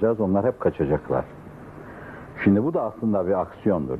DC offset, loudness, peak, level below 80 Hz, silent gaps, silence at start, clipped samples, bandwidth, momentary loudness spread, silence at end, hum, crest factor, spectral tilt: under 0.1%; -23 LUFS; -6 dBFS; -50 dBFS; none; 0 s; under 0.1%; 4.2 kHz; 19 LU; 0 s; none; 18 dB; -10.5 dB/octave